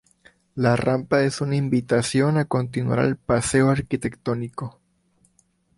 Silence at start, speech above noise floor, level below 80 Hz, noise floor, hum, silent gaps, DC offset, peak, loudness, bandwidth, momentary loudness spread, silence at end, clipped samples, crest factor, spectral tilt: 0.55 s; 43 dB; -50 dBFS; -64 dBFS; none; none; under 0.1%; -4 dBFS; -22 LUFS; 11.5 kHz; 9 LU; 1.1 s; under 0.1%; 18 dB; -6 dB/octave